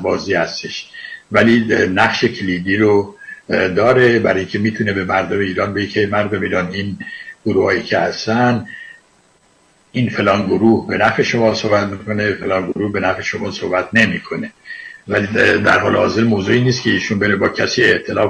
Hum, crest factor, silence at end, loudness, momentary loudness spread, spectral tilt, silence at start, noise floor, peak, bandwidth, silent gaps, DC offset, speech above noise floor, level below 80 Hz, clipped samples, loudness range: none; 14 dB; 0 s; -16 LUFS; 13 LU; -5.5 dB/octave; 0 s; -54 dBFS; -2 dBFS; 10 kHz; none; under 0.1%; 39 dB; -50 dBFS; under 0.1%; 4 LU